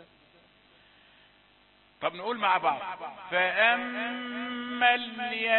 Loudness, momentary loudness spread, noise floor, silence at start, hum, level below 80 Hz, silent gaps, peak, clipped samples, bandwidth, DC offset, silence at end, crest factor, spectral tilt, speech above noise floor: -28 LUFS; 11 LU; -62 dBFS; 0 s; none; -74 dBFS; none; -8 dBFS; under 0.1%; 4.3 kHz; under 0.1%; 0 s; 22 dB; -7 dB/octave; 33 dB